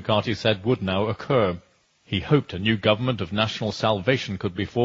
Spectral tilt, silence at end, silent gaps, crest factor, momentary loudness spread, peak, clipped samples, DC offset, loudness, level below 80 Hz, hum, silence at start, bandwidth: -6.5 dB/octave; 0 s; none; 20 dB; 6 LU; -4 dBFS; under 0.1%; under 0.1%; -24 LUFS; -52 dBFS; none; 0 s; 7.8 kHz